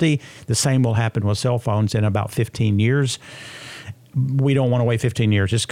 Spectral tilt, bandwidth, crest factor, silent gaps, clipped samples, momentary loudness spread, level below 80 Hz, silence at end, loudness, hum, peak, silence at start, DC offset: -5.5 dB/octave; 15.5 kHz; 14 dB; none; under 0.1%; 15 LU; -52 dBFS; 0.05 s; -20 LUFS; none; -6 dBFS; 0 s; under 0.1%